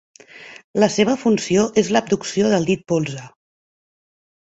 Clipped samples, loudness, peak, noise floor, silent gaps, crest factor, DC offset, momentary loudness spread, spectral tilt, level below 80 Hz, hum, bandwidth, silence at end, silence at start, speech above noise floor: under 0.1%; -19 LUFS; -2 dBFS; -42 dBFS; 0.64-0.74 s; 18 dB; under 0.1%; 12 LU; -5 dB/octave; -56 dBFS; none; 8.2 kHz; 1.2 s; 0.35 s; 24 dB